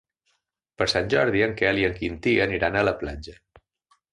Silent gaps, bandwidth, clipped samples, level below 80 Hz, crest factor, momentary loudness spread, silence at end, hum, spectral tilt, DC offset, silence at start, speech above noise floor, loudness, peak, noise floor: none; 11.5 kHz; under 0.1%; -46 dBFS; 18 dB; 11 LU; 0.8 s; none; -5.5 dB/octave; under 0.1%; 0.8 s; 50 dB; -23 LUFS; -6 dBFS; -74 dBFS